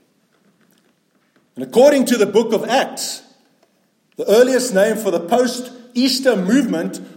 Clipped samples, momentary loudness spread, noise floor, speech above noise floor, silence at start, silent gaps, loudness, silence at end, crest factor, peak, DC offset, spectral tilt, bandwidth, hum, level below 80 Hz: under 0.1%; 13 LU; -61 dBFS; 46 dB; 1.55 s; none; -16 LUFS; 0.1 s; 16 dB; -2 dBFS; under 0.1%; -4 dB/octave; 17 kHz; none; -68 dBFS